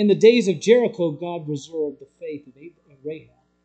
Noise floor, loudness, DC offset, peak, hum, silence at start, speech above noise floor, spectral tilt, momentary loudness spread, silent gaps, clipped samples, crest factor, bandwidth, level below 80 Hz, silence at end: -45 dBFS; -20 LUFS; under 0.1%; -2 dBFS; none; 0 s; 25 dB; -6 dB/octave; 22 LU; none; under 0.1%; 20 dB; 8.8 kHz; -72 dBFS; 0.45 s